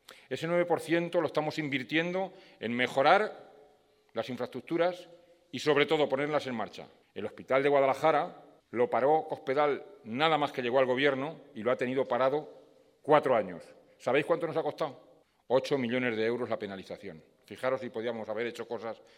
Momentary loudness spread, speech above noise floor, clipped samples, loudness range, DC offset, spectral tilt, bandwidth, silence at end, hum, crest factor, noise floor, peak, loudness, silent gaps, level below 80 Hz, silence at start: 15 LU; 35 dB; under 0.1%; 4 LU; under 0.1%; -5.5 dB/octave; 15 kHz; 0.2 s; none; 24 dB; -65 dBFS; -8 dBFS; -30 LUFS; none; -80 dBFS; 0.1 s